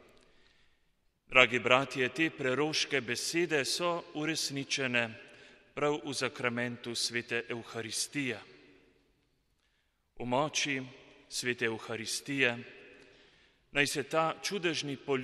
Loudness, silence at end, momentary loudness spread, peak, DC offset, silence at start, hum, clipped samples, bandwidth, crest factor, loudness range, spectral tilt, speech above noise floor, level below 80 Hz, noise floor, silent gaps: -31 LUFS; 0 s; 11 LU; -6 dBFS; under 0.1%; 1.3 s; none; under 0.1%; 13 kHz; 28 dB; 8 LU; -3 dB/octave; 43 dB; -68 dBFS; -75 dBFS; none